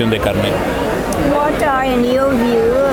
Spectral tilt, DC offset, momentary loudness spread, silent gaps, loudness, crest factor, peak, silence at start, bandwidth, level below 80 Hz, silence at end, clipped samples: -5.5 dB/octave; under 0.1%; 4 LU; none; -15 LUFS; 12 dB; -2 dBFS; 0 s; 18 kHz; -32 dBFS; 0 s; under 0.1%